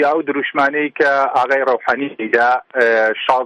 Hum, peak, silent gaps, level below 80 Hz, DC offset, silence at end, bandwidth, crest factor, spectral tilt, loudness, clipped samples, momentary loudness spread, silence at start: none; 0 dBFS; none; -62 dBFS; under 0.1%; 0 s; 10.5 kHz; 16 dB; -4.5 dB/octave; -16 LUFS; under 0.1%; 4 LU; 0 s